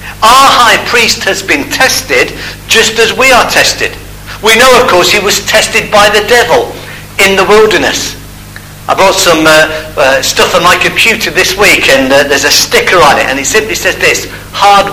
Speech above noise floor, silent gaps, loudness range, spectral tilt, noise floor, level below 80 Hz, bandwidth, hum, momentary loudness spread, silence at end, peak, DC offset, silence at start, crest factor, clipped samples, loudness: 20 dB; none; 2 LU; -2 dB/octave; -27 dBFS; -32 dBFS; over 20 kHz; 50 Hz at -35 dBFS; 10 LU; 0 s; 0 dBFS; under 0.1%; 0 s; 8 dB; 4%; -6 LUFS